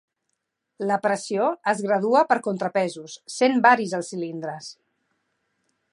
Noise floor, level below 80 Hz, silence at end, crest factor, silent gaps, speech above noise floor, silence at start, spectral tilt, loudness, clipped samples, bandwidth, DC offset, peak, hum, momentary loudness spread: -78 dBFS; -80 dBFS; 1.2 s; 20 dB; none; 56 dB; 0.8 s; -4.5 dB/octave; -22 LUFS; under 0.1%; 11.5 kHz; under 0.1%; -4 dBFS; none; 16 LU